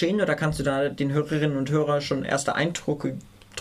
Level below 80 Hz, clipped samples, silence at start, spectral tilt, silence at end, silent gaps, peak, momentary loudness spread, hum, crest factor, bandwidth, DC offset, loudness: -50 dBFS; under 0.1%; 0 s; -5.5 dB/octave; 0 s; none; -10 dBFS; 6 LU; none; 16 dB; 13.5 kHz; under 0.1%; -25 LUFS